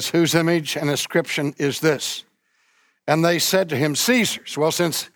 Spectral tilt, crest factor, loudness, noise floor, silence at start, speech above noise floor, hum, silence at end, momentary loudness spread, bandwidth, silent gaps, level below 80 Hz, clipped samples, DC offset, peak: -4 dB/octave; 16 dB; -20 LUFS; -64 dBFS; 0 s; 44 dB; none; 0.1 s; 7 LU; over 20 kHz; none; -66 dBFS; under 0.1%; under 0.1%; -4 dBFS